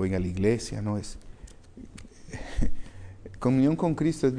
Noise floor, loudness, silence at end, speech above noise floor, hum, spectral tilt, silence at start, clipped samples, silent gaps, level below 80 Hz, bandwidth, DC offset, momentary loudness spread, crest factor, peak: -47 dBFS; -28 LUFS; 0 s; 21 dB; none; -7 dB/octave; 0 s; under 0.1%; none; -38 dBFS; 10.5 kHz; under 0.1%; 23 LU; 16 dB; -12 dBFS